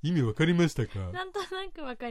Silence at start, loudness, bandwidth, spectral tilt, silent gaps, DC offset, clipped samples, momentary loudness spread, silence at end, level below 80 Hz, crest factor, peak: 0.05 s; -30 LUFS; 13 kHz; -6.5 dB/octave; none; under 0.1%; under 0.1%; 13 LU; 0 s; -50 dBFS; 16 dB; -14 dBFS